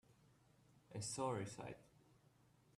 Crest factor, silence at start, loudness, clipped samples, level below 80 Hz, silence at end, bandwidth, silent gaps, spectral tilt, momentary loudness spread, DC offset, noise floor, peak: 20 dB; 0.1 s; -47 LUFS; under 0.1%; -80 dBFS; 0.9 s; 13.5 kHz; none; -4.5 dB/octave; 12 LU; under 0.1%; -73 dBFS; -30 dBFS